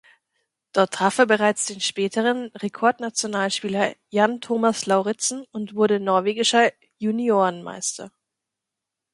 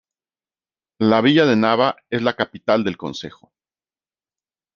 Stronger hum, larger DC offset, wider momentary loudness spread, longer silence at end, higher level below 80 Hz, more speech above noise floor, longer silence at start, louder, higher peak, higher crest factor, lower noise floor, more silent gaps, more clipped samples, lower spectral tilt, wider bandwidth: neither; neither; second, 10 LU vs 15 LU; second, 1.05 s vs 1.45 s; second, -72 dBFS vs -64 dBFS; second, 63 dB vs over 72 dB; second, 0.75 s vs 1 s; second, -22 LUFS vs -18 LUFS; about the same, -4 dBFS vs -2 dBFS; about the same, 20 dB vs 20 dB; second, -85 dBFS vs under -90 dBFS; neither; neither; second, -3 dB/octave vs -6.5 dB/octave; first, 11.5 kHz vs 7.2 kHz